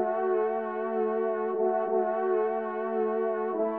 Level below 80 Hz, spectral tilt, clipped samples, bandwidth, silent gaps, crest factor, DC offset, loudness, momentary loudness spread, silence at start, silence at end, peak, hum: -84 dBFS; -6 dB/octave; under 0.1%; 3.6 kHz; none; 12 dB; under 0.1%; -29 LUFS; 3 LU; 0 s; 0 s; -16 dBFS; none